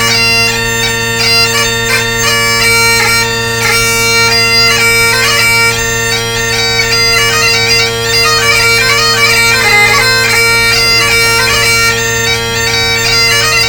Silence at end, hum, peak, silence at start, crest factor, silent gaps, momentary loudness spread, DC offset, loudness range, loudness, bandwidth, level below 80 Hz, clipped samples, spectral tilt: 0 s; none; 0 dBFS; 0 s; 10 dB; none; 5 LU; under 0.1%; 2 LU; -7 LUFS; 19 kHz; -30 dBFS; 0.2%; -1.5 dB/octave